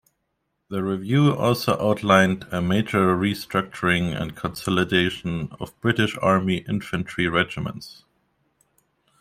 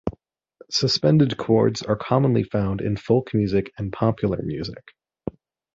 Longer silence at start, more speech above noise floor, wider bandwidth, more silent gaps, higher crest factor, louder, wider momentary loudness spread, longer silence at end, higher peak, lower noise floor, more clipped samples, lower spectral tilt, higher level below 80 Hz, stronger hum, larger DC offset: first, 0.7 s vs 0.05 s; first, 53 dB vs 32 dB; first, 16 kHz vs 7.8 kHz; neither; about the same, 20 dB vs 18 dB; about the same, -22 LUFS vs -22 LUFS; second, 11 LU vs 15 LU; first, 1.25 s vs 0.45 s; about the same, -4 dBFS vs -4 dBFS; first, -75 dBFS vs -53 dBFS; neither; about the same, -6 dB/octave vs -6.5 dB/octave; second, -54 dBFS vs -48 dBFS; neither; neither